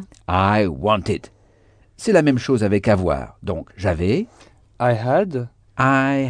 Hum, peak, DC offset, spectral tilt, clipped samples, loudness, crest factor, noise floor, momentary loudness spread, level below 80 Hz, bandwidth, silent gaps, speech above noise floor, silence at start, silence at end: none; -4 dBFS; under 0.1%; -7 dB/octave; under 0.1%; -20 LUFS; 16 dB; -54 dBFS; 12 LU; -42 dBFS; 10 kHz; none; 35 dB; 0 s; 0 s